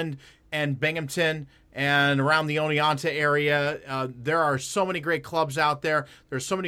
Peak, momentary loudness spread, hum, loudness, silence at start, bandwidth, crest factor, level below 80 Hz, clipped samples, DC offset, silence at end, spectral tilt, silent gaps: -8 dBFS; 11 LU; none; -25 LUFS; 0 s; 16 kHz; 18 dB; -62 dBFS; under 0.1%; under 0.1%; 0 s; -4.5 dB/octave; none